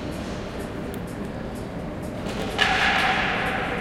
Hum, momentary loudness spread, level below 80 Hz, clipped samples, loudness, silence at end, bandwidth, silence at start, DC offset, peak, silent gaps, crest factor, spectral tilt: none; 13 LU; -40 dBFS; under 0.1%; -25 LUFS; 0 s; 16.5 kHz; 0 s; under 0.1%; -6 dBFS; none; 22 dB; -4.5 dB/octave